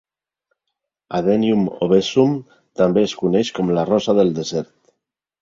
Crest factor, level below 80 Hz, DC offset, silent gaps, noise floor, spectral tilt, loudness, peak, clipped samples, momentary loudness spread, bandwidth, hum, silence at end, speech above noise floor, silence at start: 18 dB; -56 dBFS; under 0.1%; none; -79 dBFS; -6.5 dB/octave; -18 LUFS; -2 dBFS; under 0.1%; 10 LU; 7.8 kHz; none; 0.8 s; 62 dB; 1.1 s